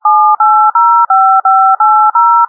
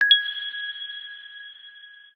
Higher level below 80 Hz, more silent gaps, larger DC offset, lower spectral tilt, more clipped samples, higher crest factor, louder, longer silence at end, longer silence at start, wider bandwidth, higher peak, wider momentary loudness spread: about the same, under -90 dBFS vs -86 dBFS; neither; neither; first, -3 dB/octave vs 2.5 dB/octave; neither; second, 6 dB vs 22 dB; first, -7 LUFS vs -24 LUFS; about the same, 0.05 s vs 0.15 s; about the same, 0.05 s vs 0 s; second, 1.8 kHz vs 14 kHz; first, 0 dBFS vs -4 dBFS; second, 1 LU vs 25 LU